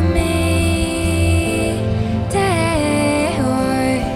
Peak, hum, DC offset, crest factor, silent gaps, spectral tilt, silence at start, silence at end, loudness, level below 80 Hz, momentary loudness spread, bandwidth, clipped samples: -4 dBFS; none; under 0.1%; 12 dB; none; -5.5 dB/octave; 0 s; 0 s; -17 LUFS; -30 dBFS; 3 LU; 14 kHz; under 0.1%